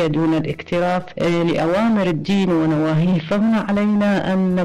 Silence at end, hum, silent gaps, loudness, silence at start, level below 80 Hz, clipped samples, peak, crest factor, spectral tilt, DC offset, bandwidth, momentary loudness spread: 0 s; none; none; -18 LUFS; 0 s; -48 dBFS; under 0.1%; -12 dBFS; 6 dB; -7.5 dB/octave; under 0.1%; 10.5 kHz; 4 LU